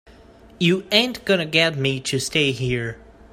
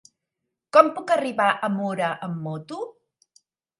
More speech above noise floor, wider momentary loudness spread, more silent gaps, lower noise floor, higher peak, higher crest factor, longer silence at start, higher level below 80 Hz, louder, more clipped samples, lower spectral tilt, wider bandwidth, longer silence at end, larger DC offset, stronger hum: second, 27 dB vs 60 dB; second, 7 LU vs 17 LU; neither; second, -47 dBFS vs -82 dBFS; about the same, 0 dBFS vs 0 dBFS; about the same, 22 dB vs 24 dB; second, 0.1 s vs 0.75 s; first, -50 dBFS vs -76 dBFS; about the same, -20 LUFS vs -22 LUFS; neither; second, -4 dB/octave vs -6 dB/octave; first, 16 kHz vs 11.5 kHz; second, 0.35 s vs 0.9 s; neither; neither